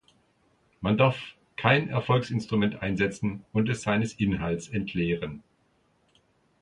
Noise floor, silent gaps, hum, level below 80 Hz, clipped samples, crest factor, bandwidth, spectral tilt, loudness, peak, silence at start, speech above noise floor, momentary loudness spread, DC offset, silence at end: -68 dBFS; none; none; -52 dBFS; under 0.1%; 24 dB; 11 kHz; -6.5 dB/octave; -27 LUFS; -4 dBFS; 0.8 s; 41 dB; 10 LU; under 0.1%; 1.2 s